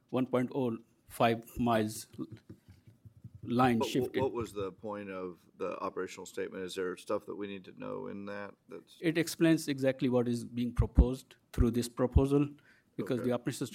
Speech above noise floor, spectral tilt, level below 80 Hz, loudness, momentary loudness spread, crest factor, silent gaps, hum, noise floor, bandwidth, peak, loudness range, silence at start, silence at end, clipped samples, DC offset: 27 dB; -6.5 dB/octave; -42 dBFS; -33 LUFS; 16 LU; 24 dB; none; none; -59 dBFS; 16.5 kHz; -8 dBFS; 8 LU; 0.1 s; 0 s; under 0.1%; under 0.1%